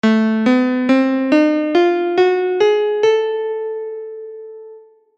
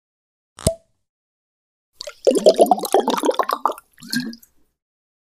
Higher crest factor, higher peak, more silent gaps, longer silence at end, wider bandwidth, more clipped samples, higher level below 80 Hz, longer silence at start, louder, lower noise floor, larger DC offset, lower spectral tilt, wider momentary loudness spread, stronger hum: second, 14 dB vs 22 dB; about the same, -2 dBFS vs 0 dBFS; second, none vs 1.09-1.92 s; second, 0.4 s vs 0.95 s; second, 8 kHz vs 16 kHz; neither; second, -70 dBFS vs -48 dBFS; second, 0.05 s vs 0.6 s; first, -16 LUFS vs -19 LUFS; second, -42 dBFS vs -47 dBFS; neither; first, -6 dB/octave vs -4 dB/octave; second, 16 LU vs 21 LU; neither